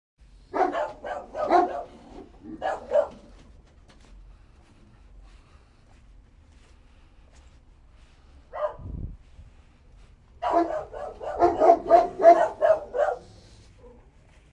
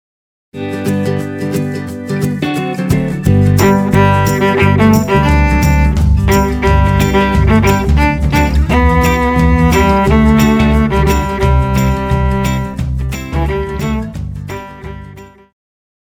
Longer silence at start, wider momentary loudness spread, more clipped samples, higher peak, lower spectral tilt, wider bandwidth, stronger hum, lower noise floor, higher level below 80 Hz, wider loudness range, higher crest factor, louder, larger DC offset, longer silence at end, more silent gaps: about the same, 0.55 s vs 0.55 s; first, 23 LU vs 11 LU; neither; second, -4 dBFS vs 0 dBFS; about the same, -6.5 dB/octave vs -6.5 dB/octave; second, 8.6 kHz vs 19 kHz; neither; first, -54 dBFS vs -34 dBFS; second, -50 dBFS vs -18 dBFS; first, 19 LU vs 7 LU; first, 24 dB vs 12 dB; second, -24 LUFS vs -12 LUFS; neither; second, 0.65 s vs 0.8 s; neither